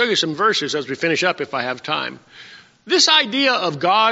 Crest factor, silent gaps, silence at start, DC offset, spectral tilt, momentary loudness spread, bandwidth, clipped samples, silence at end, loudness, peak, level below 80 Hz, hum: 18 dB; none; 0 s; under 0.1%; -0.5 dB/octave; 11 LU; 8 kHz; under 0.1%; 0 s; -17 LUFS; -2 dBFS; -68 dBFS; none